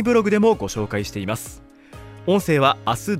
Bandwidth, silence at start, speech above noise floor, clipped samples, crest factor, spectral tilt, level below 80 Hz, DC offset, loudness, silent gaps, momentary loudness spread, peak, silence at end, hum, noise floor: 16 kHz; 0 s; 22 dB; under 0.1%; 16 dB; -5.5 dB/octave; -48 dBFS; under 0.1%; -20 LUFS; none; 12 LU; -4 dBFS; 0 s; none; -42 dBFS